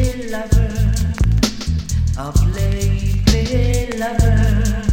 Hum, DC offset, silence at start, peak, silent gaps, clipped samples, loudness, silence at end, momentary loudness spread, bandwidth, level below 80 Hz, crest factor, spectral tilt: none; under 0.1%; 0 s; 0 dBFS; none; under 0.1%; -18 LUFS; 0 s; 5 LU; 16.5 kHz; -20 dBFS; 16 dB; -6 dB/octave